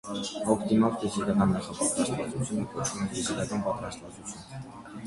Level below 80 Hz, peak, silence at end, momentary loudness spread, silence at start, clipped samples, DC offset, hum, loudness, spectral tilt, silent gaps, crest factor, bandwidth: -54 dBFS; -8 dBFS; 0 s; 16 LU; 0.05 s; under 0.1%; under 0.1%; none; -29 LUFS; -5 dB/octave; none; 20 dB; 11.5 kHz